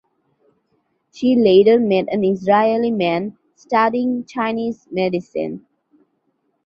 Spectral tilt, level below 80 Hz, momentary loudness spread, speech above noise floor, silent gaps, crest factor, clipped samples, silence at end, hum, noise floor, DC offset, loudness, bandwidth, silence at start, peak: -7.5 dB/octave; -62 dBFS; 13 LU; 51 dB; none; 16 dB; under 0.1%; 1.1 s; none; -68 dBFS; under 0.1%; -17 LUFS; 7.2 kHz; 1.15 s; -2 dBFS